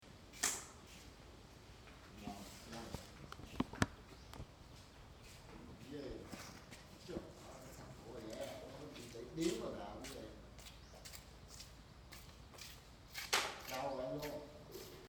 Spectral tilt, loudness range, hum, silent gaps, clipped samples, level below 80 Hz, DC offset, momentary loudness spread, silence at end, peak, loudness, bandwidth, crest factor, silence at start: -3 dB/octave; 9 LU; none; none; under 0.1%; -62 dBFS; under 0.1%; 18 LU; 0 s; -14 dBFS; -47 LUFS; over 20 kHz; 34 dB; 0 s